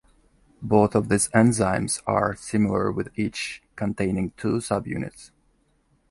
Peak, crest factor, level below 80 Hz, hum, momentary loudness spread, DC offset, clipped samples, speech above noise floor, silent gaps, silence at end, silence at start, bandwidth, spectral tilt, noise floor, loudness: -4 dBFS; 20 dB; -48 dBFS; none; 12 LU; under 0.1%; under 0.1%; 42 dB; none; 0.85 s; 0.6 s; 11.5 kHz; -5.5 dB/octave; -65 dBFS; -24 LUFS